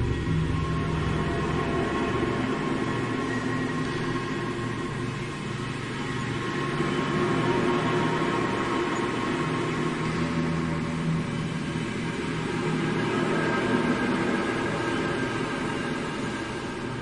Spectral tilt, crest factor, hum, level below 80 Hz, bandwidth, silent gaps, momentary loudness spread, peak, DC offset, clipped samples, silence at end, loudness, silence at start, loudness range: -6 dB/octave; 16 dB; none; -44 dBFS; 11.5 kHz; none; 6 LU; -10 dBFS; under 0.1%; under 0.1%; 0 s; -27 LUFS; 0 s; 3 LU